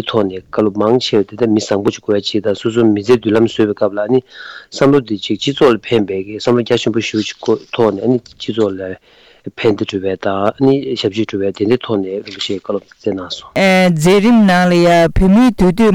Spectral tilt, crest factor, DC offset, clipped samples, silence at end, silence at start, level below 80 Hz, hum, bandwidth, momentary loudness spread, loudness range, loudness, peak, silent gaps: -6 dB/octave; 12 dB; under 0.1%; under 0.1%; 0 s; 0 s; -34 dBFS; none; 16 kHz; 11 LU; 5 LU; -14 LUFS; -2 dBFS; none